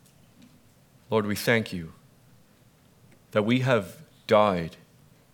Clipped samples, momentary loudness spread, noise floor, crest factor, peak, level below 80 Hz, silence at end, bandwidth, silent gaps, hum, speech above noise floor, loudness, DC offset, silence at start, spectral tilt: under 0.1%; 18 LU; -59 dBFS; 22 dB; -6 dBFS; -62 dBFS; 0.65 s; 19 kHz; none; none; 34 dB; -25 LUFS; under 0.1%; 1.1 s; -6 dB/octave